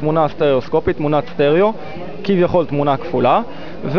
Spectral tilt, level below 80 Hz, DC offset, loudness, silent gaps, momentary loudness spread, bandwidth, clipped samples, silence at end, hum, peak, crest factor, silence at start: -9 dB/octave; -42 dBFS; 4%; -16 LUFS; none; 12 LU; 5.4 kHz; under 0.1%; 0 s; none; -4 dBFS; 14 dB; 0 s